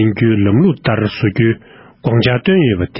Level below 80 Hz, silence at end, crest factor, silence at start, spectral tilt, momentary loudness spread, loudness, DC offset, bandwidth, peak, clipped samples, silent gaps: -38 dBFS; 0 s; 14 dB; 0 s; -12 dB/octave; 4 LU; -14 LUFS; under 0.1%; 5.8 kHz; 0 dBFS; under 0.1%; none